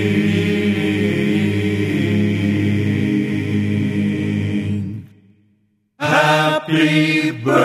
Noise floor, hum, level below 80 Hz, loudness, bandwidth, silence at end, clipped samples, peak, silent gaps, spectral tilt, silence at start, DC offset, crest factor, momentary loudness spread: -62 dBFS; none; -58 dBFS; -17 LUFS; 14.5 kHz; 0 s; under 0.1%; -2 dBFS; none; -6.5 dB/octave; 0 s; under 0.1%; 16 dB; 7 LU